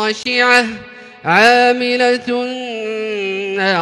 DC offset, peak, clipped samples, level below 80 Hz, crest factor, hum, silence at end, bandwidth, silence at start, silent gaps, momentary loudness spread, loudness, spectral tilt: under 0.1%; 0 dBFS; under 0.1%; -60 dBFS; 16 dB; none; 0 s; 14.5 kHz; 0 s; none; 13 LU; -14 LUFS; -3.5 dB/octave